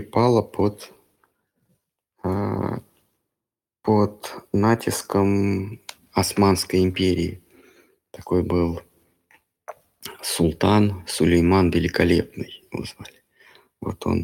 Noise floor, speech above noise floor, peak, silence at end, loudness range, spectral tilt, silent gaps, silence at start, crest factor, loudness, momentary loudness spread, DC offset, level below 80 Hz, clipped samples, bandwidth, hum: -88 dBFS; 67 dB; -4 dBFS; 0 s; 7 LU; -6 dB/octave; none; 0 s; 20 dB; -22 LUFS; 18 LU; under 0.1%; -46 dBFS; under 0.1%; 17.5 kHz; none